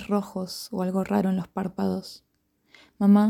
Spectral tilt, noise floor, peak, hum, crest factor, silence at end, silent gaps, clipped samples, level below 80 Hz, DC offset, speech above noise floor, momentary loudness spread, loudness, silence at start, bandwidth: -7.5 dB/octave; -60 dBFS; -10 dBFS; none; 16 dB; 0 s; none; under 0.1%; -62 dBFS; under 0.1%; 36 dB; 9 LU; -27 LUFS; 0 s; 15 kHz